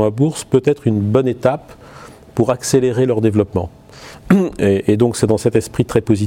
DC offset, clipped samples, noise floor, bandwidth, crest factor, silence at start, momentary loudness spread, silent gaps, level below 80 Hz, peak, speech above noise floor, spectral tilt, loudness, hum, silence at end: under 0.1%; under 0.1%; -38 dBFS; 16.5 kHz; 16 dB; 0 s; 8 LU; none; -44 dBFS; 0 dBFS; 23 dB; -6.5 dB/octave; -16 LUFS; none; 0 s